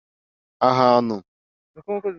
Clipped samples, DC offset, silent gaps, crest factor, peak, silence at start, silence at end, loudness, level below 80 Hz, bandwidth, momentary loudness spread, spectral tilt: under 0.1%; under 0.1%; 1.28-1.74 s; 20 dB; -2 dBFS; 0.6 s; 0 s; -20 LUFS; -66 dBFS; 6.8 kHz; 14 LU; -7 dB/octave